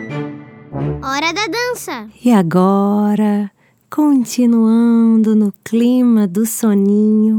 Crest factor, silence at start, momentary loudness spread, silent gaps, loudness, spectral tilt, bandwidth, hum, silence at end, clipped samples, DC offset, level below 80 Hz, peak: 14 dB; 0 s; 13 LU; none; -14 LUFS; -6 dB/octave; 18 kHz; none; 0 s; under 0.1%; under 0.1%; -48 dBFS; 0 dBFS